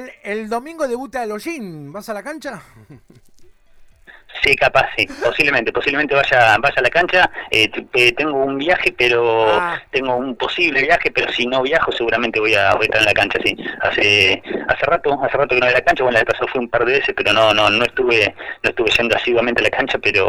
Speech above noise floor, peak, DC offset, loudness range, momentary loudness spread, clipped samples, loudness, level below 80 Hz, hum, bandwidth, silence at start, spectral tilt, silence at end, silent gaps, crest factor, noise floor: 29 dB; 0 dBFS; under 0.1%; 8 LU; 11 LU; under 0.1%; -15 LUFS; -44 dBFS; none; 16.5 kHz; 0 s; -4 dB/octave; 0 s; none; 16 dB; -46 dBFS